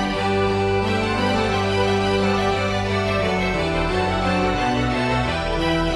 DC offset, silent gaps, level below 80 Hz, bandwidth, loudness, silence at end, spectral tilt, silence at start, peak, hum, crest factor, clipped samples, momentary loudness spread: under 0.1%; none; -34 dBFS; 12.5 kHz; -20 LUFS; 0 s; -5.5 dB/octave; 0 s; -6 dBFS; none; 14 dB; under 0.1%; 2 LU